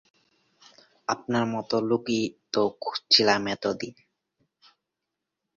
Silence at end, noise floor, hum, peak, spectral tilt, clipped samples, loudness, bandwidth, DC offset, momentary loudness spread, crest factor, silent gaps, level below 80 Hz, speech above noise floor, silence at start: 1.65 s; -85 dBFS; none; -4 dBFS; -4 dB/octave; under 0.1%; -25 LUFS; 7.4 kHz; under 0.1%; 14 LU; 24 dB; none; -68 dBFS; 59 dB; 1.1 s